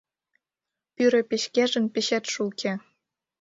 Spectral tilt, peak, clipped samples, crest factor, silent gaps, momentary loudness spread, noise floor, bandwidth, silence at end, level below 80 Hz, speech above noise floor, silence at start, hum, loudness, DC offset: -3.5 dB/octave; -10 dBFS; under 0.1%; 18 dB; none; 8 LU; -88 dBFS; 7.8 kHz; 0.65 s; -74 dBFS; 64 dB; 1 s; none; -25 LUFS; under 0.1%